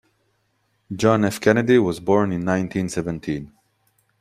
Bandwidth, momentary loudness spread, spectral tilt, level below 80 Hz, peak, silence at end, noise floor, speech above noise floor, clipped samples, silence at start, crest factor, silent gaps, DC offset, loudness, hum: 15.5 kHz; 11 LU; -6.5 dB/octave; -54 dBFS; -2 dBFS; 0.75 s; -68 dBFS; 48 dB; under 0.1%; 0.9 s; 20 dB; none; under 0.1%; -20 LUFS; none